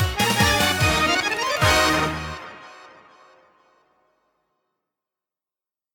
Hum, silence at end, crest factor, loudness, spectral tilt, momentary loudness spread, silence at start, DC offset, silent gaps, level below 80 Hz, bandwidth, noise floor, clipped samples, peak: none; 3.1 s; 20 dB; -19 LUFS; -3 dB/octave; 18 LU; 0 s; under 0.1%; none; -40 dBFS; 18 kHz; under -90 dBFS; under 0.1%; -6 dBFS